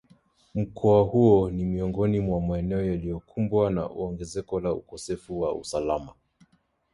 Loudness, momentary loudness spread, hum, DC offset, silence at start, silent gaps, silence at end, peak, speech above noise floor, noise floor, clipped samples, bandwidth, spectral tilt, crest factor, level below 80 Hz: -26 LUFS; 13 LU; none; under 0.1%; 0.55 s; none; 0.85 s; -8 dBFS; 41 dB; -66 dBFS; under 0.1%; 11.5 kHz; -8 dB/octave; 18 dB; -46 dBFS